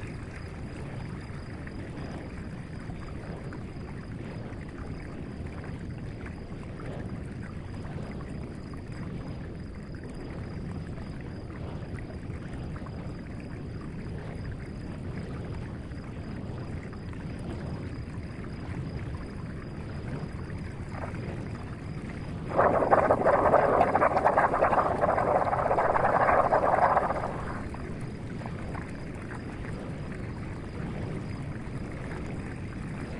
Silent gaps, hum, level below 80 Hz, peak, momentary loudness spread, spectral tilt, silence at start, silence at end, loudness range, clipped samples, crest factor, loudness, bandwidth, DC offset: none; none; -46 dBFS; -6 dBFS; 16 LU; -7.5 dB/octave; 0 s; 0 s; 15 LU; under 0.1%; 24 dB; -32 LUFS; 11.5 kHz; under 0.1%